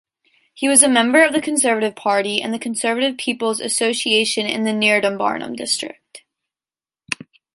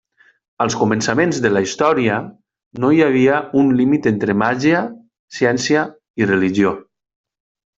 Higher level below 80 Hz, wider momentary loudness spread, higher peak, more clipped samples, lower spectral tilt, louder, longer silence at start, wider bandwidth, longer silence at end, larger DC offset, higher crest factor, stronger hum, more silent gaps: second, -66 dBFS vs -56 dBFS; about the same, 11 LU vs 9 LU; about the same, 0 dBFS vs 0 dBFS; neither; second, -1.5 dB/octave vs -5.5 dB/octave; about the same, -17 LUFS vs -16 LUFS; about the same, 0.55 s vs 0.6 s; first, 13 kHz vs 8 kHz; second, 0.4 s vs 0.95 s; neither; about the same, 20 dB vs 16 dB; neither; second, none vs 2.66-2.71 s, 5.19-5.28 s, 6.10-6.14 s